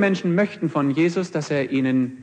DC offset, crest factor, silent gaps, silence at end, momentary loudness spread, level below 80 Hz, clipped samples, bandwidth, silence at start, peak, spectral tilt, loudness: under 0.1%; 16 dB; none; 0 s; 4 LU; -70 dBFS; under 0.1%; 9.2 kHz; 0 s; -6 dBFS; -7 dB/octave; -22 LUFS